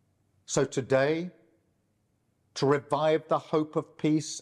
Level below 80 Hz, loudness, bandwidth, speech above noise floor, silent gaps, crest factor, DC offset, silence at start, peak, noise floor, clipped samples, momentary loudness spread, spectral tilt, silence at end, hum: -70 dBFS; -28 LUFS; 11 kHz; 46 dB; none; 16 dB; under 0.1%; 0.5 s; -14 dBFS; -73 dBFS; under 0.1%; 7 LU; -5 dB/octave; 0 s; none